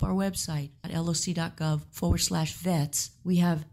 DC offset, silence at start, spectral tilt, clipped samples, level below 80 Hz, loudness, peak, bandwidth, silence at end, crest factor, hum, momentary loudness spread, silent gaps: under 0.1%; 0 s; -5 dB/octave; under 0.1%; -44 dBFS; -29 LUFS; -12 dBFS; 16 kHz; 0.1 s; 16 dB; none; 6 LU; none